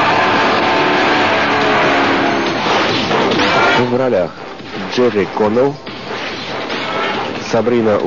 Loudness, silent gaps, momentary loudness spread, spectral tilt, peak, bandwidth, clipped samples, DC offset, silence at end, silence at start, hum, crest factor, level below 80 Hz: -14 LUFS; none; 10 LU; -2.5 dB/octave; -4 dBFS; 7.4 kHz; under 0.1%; 0.9%; 0 s; 0 s; none; 10 dB; -48 dBFS